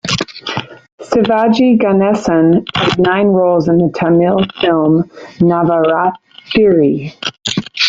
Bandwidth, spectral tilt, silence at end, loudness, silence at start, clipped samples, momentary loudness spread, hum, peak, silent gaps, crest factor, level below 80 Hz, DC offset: 8 kHz; -6 dB/octave; 0 s; -12 LUFS; 0.05 s; under 0.1%; 9 LU; none; 0 dBFS; 0.92-0.98 s; 12 dB; -46 dBFS; under 0.1%